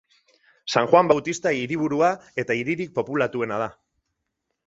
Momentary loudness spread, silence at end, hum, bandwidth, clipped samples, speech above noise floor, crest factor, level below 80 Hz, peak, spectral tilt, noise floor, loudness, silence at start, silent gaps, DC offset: 11 LU; 0.95 s; none; 8 kHz; under 0.1%; 57 dB; 22 dB; -64 dBFS; -2 dBFS; -5 dB/octave; -79 dBFS; -23 LUFS; 0.65 s; none; under 0.1%